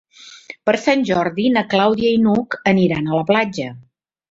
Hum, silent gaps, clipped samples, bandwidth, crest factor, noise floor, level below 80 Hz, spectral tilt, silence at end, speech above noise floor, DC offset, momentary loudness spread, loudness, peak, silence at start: none; none; under 0.1%; 7.8 kHz; 16 dB; -39 dBFS; -54 dBFS; -6.5 dB/octave; 0.5 s; 23 dB; under 0.1%; 8 LU; -17 LUFS; -2 dBFS; 0.2 s